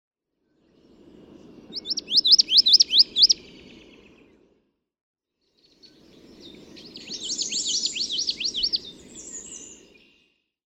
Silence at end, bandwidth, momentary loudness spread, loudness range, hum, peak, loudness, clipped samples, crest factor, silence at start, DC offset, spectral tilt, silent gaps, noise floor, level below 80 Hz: 1.05 s; 17 kHz; 24 LU; 13 LU; none; -4 dBFS; -18 LUFS; under 0.1%; 22 dB; 1.7 s; under 0.1%; 1 dB/octave; 5.01-5.14 s; -71 dBFS; -62 dBFS